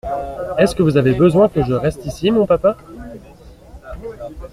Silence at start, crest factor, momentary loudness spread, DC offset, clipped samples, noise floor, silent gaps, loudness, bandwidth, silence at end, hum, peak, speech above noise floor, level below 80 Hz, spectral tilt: 0.05 s; 16 dB; 20 LU; under 0.1%; under 0.1%; -41 dBFS; none; -16 LUFS; 14.5 kHz; 0.05 s; none; -2 dBFS; 26 dB; -38 dBFS; -7.5 dB/octave